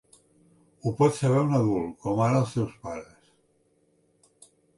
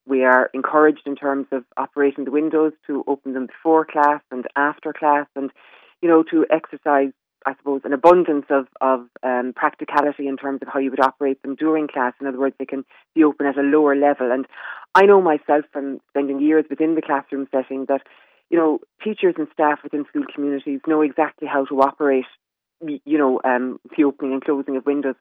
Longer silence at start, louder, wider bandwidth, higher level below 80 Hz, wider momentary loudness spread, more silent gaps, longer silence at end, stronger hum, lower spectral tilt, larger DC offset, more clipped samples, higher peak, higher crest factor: first, 0.85 s vs 0.05 s; second, -25 LUFS vs -20 LUFS; first, 11.5 kHz vs 6.2 kHz; first, -60 dBFS vs -70 dBFS; first, 14 LU vs 11 LU; neither; first, 1.75 s vs 0.1 s; neither; about the same, -7.5 dB/octave vs -7.5 dB/octave; neither; neither; second, -10 dBFS vs -2 dBFS; about the same, 18 dB vs 18 dB